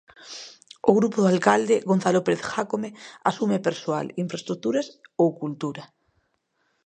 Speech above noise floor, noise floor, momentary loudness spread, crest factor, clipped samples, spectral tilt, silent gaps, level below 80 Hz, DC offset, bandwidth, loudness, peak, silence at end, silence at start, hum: 49 dB; -72 dBFS; 17 LU; 22 dB; under 0.1%; -6 dB/octave; none; -70 dBFS; under 0.1%; 9.4 kHz; -24 LUFS; -2 dBFS; 1 s; 0.25 s; none